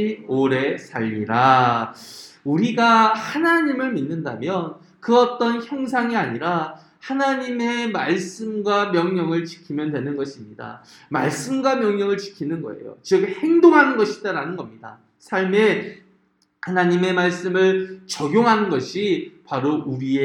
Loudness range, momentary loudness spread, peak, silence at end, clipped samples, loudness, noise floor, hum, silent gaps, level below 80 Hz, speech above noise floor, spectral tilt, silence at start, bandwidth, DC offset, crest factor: 5 LU; 15 LU; -2 dBFS; 0 s; under 0.1%; -20 LUFS; -63 dBFS; none; none; -68 dBFS; 43 dB; -5.5 dB/octave; 0 s; 12.5 kHz; under 0.1%; 20 dB